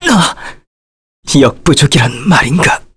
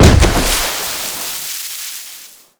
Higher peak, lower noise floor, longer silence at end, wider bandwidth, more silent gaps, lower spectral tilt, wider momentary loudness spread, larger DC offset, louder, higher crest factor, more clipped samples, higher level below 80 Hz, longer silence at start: about the same, 0 dBFS vs 0 dBFS; first, under -90 dBFS vs -37 dBFS; second, 0.15 s vs 0.35 s; second, 11 kHz vs over 20 kHz; first, 0.67-1.23 s vs none; about the same, -4.5 dB/octave vs -4 dB/octave; first, 18 LU vs 15 LU; neither; first, -10 LUFS vs -16 LUFS; about the same, 12 dB vs 14 dB; second, under 0.1% vs 0.5%; second, -32 dBFS vs -20 dBFS; about the same, 0 s vs 0 s